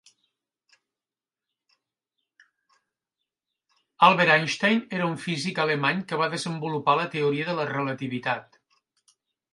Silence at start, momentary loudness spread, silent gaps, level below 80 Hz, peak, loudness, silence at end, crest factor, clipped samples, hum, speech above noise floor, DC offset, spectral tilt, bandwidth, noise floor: 4 s; 10 LU; none; -76 dBFS; -4 dBFS; -24 LUFS; 1.1 s; 24 dB; under 0.1%; none; over 66 dB; under 0.1%; -5 dB/octave; 11.5 kHz; under -90 dBFS